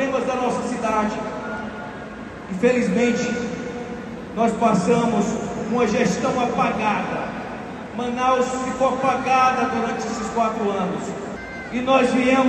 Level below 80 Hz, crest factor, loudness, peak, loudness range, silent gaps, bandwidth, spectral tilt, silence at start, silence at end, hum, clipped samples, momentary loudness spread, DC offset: -50 dBFS; 16 dB; -22 LUFS; -4 dBFS; 3 LU; none; 11.5 kHz; -5.5 dB/octave; 0 s; 0 s; none; under 0.1%; 14 LU; under 0.1%